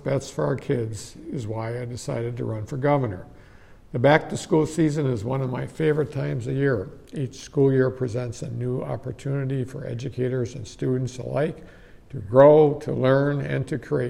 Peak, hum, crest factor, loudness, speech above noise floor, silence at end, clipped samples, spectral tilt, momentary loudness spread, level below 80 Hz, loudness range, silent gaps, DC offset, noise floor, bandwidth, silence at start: -4 dBFS; none; 20 dB; -24 LUFS; 25 dB; 0 s; under 0.1%; -7 dB/octave; 13 LU; -52 dBFS; 7 LU; none; under 0.1%; -48 dBFS; 12 kHz; 0 s